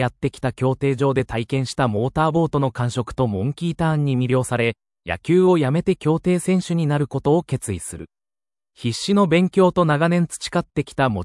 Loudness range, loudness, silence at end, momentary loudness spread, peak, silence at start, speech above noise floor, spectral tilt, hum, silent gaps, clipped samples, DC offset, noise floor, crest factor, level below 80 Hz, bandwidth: 2 LU; -20 LUFS; 0 s; 9 LU; -4 dBFS; 0 s; over 70 dB; -6.5 dB/octave; none; none; under 0.1%; under 0.1%; under -90 dBFS; 16 dB; -48 dBFS; 12 kHz